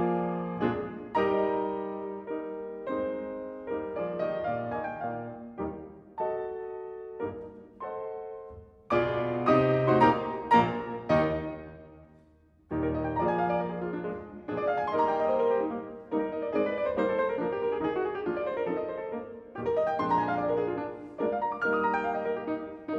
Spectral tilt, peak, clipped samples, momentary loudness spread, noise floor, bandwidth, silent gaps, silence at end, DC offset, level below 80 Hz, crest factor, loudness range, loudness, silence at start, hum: -8.5 dB/octave; -10 dBFS; under 0.1%; 14 LU; -61 dBFS; 7.2 kHz; none; 0 s; under 0.1%; -58 dBFS; 20 dB; 8 LU; -30 LUFS; 0 s; none